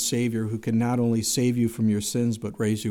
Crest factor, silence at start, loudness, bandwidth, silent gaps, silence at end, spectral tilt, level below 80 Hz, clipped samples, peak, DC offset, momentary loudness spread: 12 dB; 0 s; -25 LUFS; 17 kHz; none; 0 s; -5 dB/octave; -58 dBFS; under 0.1%; -12 dBFS; under 0.1%; 4 LU